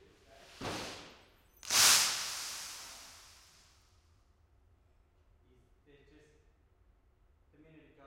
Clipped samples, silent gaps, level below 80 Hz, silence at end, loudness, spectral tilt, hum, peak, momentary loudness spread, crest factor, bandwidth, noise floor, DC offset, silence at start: under 0.1%; none; -68 dBFS; 4.9 s; -29 LUFS; 1 dB/octave; none; -12 dBFS; 27 LU; 28 dB; 16.5 kHz; -68 dBFS; under 0.1%; 0.5 s